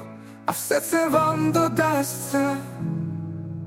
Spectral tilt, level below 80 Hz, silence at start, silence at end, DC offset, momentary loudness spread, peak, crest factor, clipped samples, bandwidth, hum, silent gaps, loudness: -5 dB/octave; -60 dBFS; 0 s; 0 s; under 0.1%; 11 LU; -6 dBFS; 18 dB; under 0.1%; 17 kHz; none; none; -24 LUFS